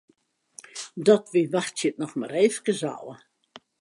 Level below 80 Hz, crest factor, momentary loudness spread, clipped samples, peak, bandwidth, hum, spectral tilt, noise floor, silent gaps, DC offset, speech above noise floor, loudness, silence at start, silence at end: -80 dBFS; 20 dB; 18 LU; under 0.1%; -6 dBFS; 11.5 kHz; none; -4.5 dB/octave; -66 dBFS; none; under 0.1%; 42 dB; -24 LUFS; 0.75 s; 0.65 s